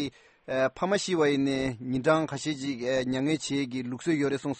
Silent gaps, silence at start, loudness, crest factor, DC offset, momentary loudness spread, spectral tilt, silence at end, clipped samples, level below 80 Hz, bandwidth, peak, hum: none; 0 s; -28 LUFS; 18 dB; under 0.1%; 7 LU; -5 dB/octave; 0 s; under 0.1%; -60 dBFS; 8.8 kHz; -10 dBFS; none